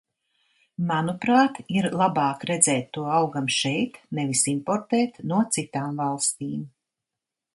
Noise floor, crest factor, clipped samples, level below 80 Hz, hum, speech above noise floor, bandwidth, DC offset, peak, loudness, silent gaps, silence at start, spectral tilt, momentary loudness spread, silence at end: -87 dBFS; 22 dB; under 0.1%; -68 dBFS; none; 63 dB; 11.5 kHz; under 0.1%; -2 dBFS; -24 LUFS; none; 0.8 s; -4 dB/octave; 10 LU; 0.85 s